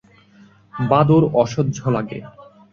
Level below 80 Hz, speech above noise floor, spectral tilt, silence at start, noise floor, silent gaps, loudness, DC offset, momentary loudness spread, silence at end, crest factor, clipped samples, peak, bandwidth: -50 dBFS; 32 dB; -8 dB/octave; 0.75 s; -50 dBFS; none; -18 LUFS; under 0.1%; 18 LU; 0.45 s; 18 dB; under 0.1%; -2 dBFS; 7.2 kHz